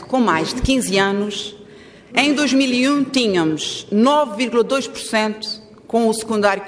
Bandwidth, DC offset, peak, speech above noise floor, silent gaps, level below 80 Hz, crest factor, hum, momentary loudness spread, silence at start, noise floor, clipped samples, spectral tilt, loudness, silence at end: 11 kHz; under 0.1%; -2 dBFS; 25 dB; none; -40 dBFS; 16 dB; none; 8 LU; 0 s; -42 dBFS; under 0.1%; -4 dB/octave; -18 LUFS; 0 s